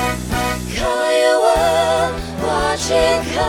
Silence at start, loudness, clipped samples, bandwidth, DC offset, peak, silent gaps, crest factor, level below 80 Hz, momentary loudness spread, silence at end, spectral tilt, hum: 0 s; -17 LUFS; under 0.1%; 17.5 kHz; under 0.1%; -2 dBFS; none; 14 dB; -32 dBFS; 7 LU; 0 s; -4 dB/octave; none